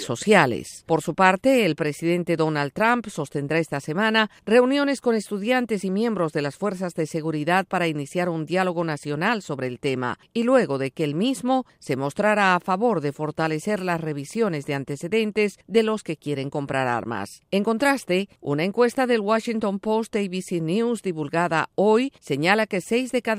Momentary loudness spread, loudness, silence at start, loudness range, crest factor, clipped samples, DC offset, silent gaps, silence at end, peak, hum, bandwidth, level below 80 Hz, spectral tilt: 8 LU; -23 LUFS; 0 s; 3 LU; 22 dB; under 0.1%; under 0.1%; none; 0 s; -2 dBFS; none; 15.5 kHz; -64 dBFS; -5.5 dB/octave